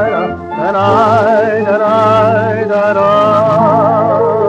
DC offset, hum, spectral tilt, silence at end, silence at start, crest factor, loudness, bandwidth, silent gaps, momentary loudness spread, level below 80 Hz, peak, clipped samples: under 0.1%; none; -7.5 dB/octave; 0 s; 0 s; 10 dB; -10 LUFS; 8.4 kHz; none; 5 LU; -48 dBFS; 0 dBFS; under 0.1%